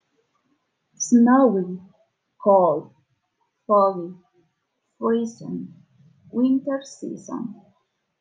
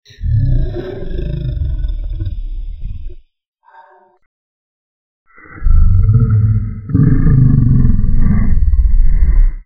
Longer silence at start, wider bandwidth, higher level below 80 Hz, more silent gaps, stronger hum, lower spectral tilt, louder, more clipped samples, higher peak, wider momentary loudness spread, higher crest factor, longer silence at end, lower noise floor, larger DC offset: first, 1 s vs 0.2 s; first, 9.4 kHz vs 3.9 kHz; second, -78 dBFS vs -14 dBFS; second, none vs 3.48-3.53 s, 4.26-5.26 s; neither; second, -6 dB/octave vs -11.5 dB/octave; second, -21 LUFS vs -15 LUFS; neither; second, -6 dBFS vs 0 dBFS; first, 18 LU vs 15 LU; first, 18 dB vs 12 dB; first, 0.65 s vs 0.05 s; first, -75 dBFS vs -45 dBFS; neither